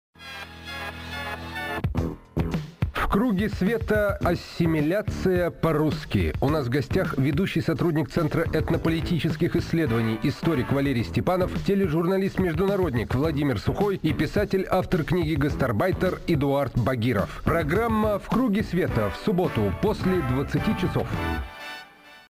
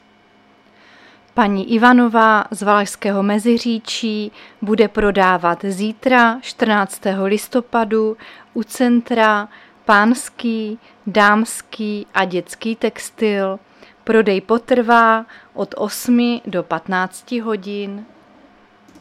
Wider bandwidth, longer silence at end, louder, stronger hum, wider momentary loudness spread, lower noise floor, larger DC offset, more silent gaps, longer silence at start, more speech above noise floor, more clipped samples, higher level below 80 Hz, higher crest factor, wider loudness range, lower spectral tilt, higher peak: about the same, 15.5 kHz vs 15 kHz; second, 0.2 s vs 0.95 s; second, -25 LUFS vs -17 LUFS; neither; second, 7 LU vs 13 LU; second, -47 dBFS vs -52 dBFS; neither; neither; second, 0.2 s vs 1.35 s; second, 23 dB vs 35 dB; neither; first, -38 dBFS vs -48 dBFS; about the same, 14 dB vs 18 dB; about the same, 2 LU vs 4 LU; first, -7.5 dB/octave vs -4.5 dB/octave; second, -10 dBFS vs 0 dBFS